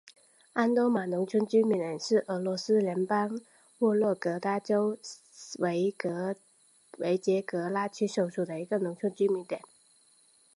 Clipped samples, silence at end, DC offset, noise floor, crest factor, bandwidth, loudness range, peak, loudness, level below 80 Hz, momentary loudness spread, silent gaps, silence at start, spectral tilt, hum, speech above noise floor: under 0.1%; 1 s; under 0.1%; -64 dBFS; 18 dB; 11.5 kHz; 4 LU; -12 dBFS; -30 LUFS; -82 dBFS; 10 LU; none; 0.05 s; -6 dB/octave; none; 35 dB